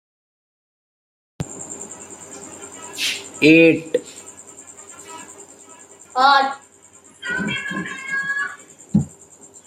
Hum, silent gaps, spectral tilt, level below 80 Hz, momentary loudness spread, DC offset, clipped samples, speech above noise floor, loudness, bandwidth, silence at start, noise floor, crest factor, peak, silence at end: none; none; -4 dB/octave; -60 dBFS; 24 LU; under 0.1%; under 0.1%; 33 dB; -19 LUFS; 15.5 kHz; 1.4 s; -49 dBFS; 22 dB; -2 dBFS; 0.6 s